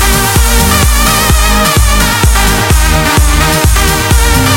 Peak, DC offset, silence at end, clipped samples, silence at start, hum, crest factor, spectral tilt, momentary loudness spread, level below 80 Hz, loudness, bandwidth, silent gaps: 0 dBFS; under 0.1%; 0 s; 0.4%; 0 s; none; 8 dB; -3.5 dB/octave; 1 LU; -10 dBFS; -8 LUFS; 17.5 kHz; none